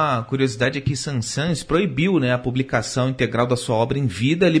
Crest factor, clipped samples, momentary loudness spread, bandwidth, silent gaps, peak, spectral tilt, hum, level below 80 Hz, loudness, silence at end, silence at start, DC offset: 14 dB; under 0.1%; 5 LU; 11 kHz; none; -6 dBFS; -5.5 dB/octave; none; -46 dBFS; -21 LUFS; 0 s; 0 s; under 0.1%